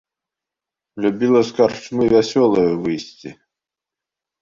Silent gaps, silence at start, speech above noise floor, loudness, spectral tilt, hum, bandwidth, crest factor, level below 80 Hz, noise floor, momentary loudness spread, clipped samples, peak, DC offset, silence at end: none; 0.95 s; 70 dB; -17 LUFS; -6 dB/octave; none; 7.6 kHz; 18 dB; -54 dBFS; -87 dBFS; 16 LU; under 0.1%; -2 dBFS; under 0.1%; 1.1 s